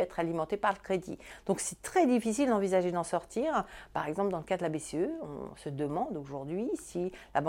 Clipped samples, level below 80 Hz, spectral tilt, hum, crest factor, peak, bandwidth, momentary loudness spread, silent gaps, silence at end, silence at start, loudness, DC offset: under 0.1%; -60 dBFS; -5.5 dB/octave; none; 18 dB; -14 dBFS; 16.5 kHz; 11 LU; none; 0 s; 0 s; -33 LUFS; under 0.1%